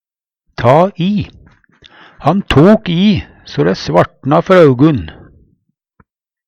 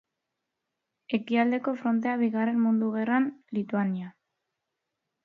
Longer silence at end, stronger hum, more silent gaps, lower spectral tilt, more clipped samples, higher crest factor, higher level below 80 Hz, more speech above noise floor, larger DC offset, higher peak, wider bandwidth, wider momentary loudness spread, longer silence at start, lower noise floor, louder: first, 1.35 s vs 1.15 s; neither; neither; about the same, -7.5 dB/octave vs -8.5 dB/octave; first, 0.1% vs under 0.1%; second, 12 dB vs 18 dB; first, -36 dBFS vs -78 dBFS; about the same, 55 dB vs 58 dB; neither; first, 0 dBFS vs -10 dBFS; first, 9.4 kHz vs 4.5 kHz; first, 12 LU vs 7 LU; second, 0.6 s vs 1.1 s; second, -65 dBFS vs -84 dBFS; first, -11 LUFS vs -27 LUFS